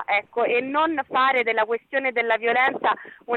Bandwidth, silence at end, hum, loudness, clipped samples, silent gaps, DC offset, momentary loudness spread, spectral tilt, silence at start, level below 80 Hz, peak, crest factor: 4.4 kHz; 0 s; none; -22 LUFS; under 0.1%; none; under 0.1%; 5 LU; -5.5 dB/octave; 0 s; -72 dBFS; -10 dBFS; 14 dB